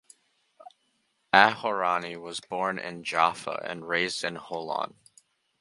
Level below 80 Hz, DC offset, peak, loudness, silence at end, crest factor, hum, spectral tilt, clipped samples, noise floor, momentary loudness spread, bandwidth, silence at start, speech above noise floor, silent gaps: -70 dBFS; under 0.1%; 0 dBFS; -27 LUFS; 0.75 s; 28 dB; none; -3 dB/octave; under 0.1%; -73 dBFS; 15 LU; 11.5 kHz; 1.35 s; 45 dB; none